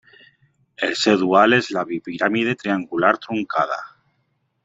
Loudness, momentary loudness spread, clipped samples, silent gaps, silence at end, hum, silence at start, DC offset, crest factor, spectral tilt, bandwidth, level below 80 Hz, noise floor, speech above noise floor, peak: -20 LUFS; 10 LU; under 0.1%; none; 0.8 s; none; 0.8 s; under 0.1%; 20 dB; -5 dB/octave; 8 kHz; -64 dBFS; -69 dBFS; 50 dB; -2 dBFS